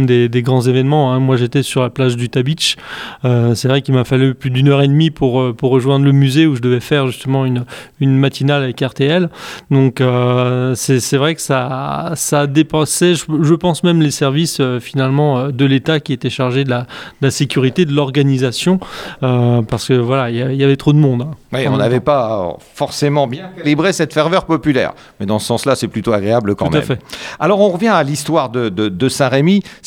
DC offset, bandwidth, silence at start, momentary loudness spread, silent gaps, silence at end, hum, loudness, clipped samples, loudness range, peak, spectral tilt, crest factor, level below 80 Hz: under 0.1%; 16 kHz; 0 s; 7 LU; none; 0.1 s; none; -14 LUFS; under 0.1%; 3 LU; 0 dBFS; -6 dB/octave; 14 dB; -46 dBFS